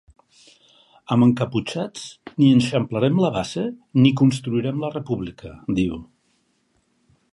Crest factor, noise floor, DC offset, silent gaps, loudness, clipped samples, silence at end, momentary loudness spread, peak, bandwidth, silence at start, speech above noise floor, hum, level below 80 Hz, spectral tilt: 18 dB; -66 dBFS; under 0.1%; none; -21 LUFS; under 0.1%; 1.3 s; 14 LU; -2 dBFS; 11.5 kHz; 1.1 s; 46 dB; none; -52 dBFS; -7 dB/octave